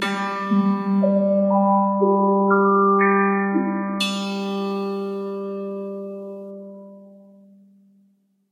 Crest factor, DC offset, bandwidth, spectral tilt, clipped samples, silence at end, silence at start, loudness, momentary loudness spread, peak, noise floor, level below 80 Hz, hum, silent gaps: 16 dB; under 0.1%; 12 kHz; -6.5 dB/octave; under 0.1%; 1.4 s; 0 s; -20 LUFS; 16 LU; -6 dBFS; -62 dBFS; -78 dBFS; none; none